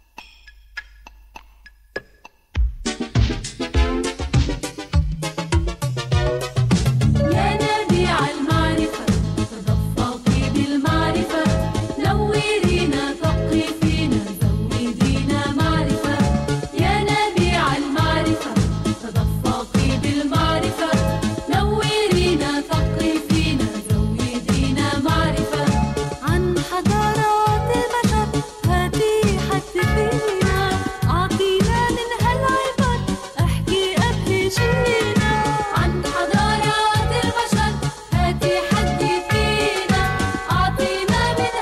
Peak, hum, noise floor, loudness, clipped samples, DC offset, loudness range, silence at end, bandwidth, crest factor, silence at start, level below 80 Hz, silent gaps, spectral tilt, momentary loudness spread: -4 dBFS; none; -49 dBFS; -20 LUFS; under 0.1%; under 0.1%; 3 LU; 0 s; 15 kHz; 14 dB; 0.2 s; -30 dBFS; none; -5.5 dB/octave; 5 LU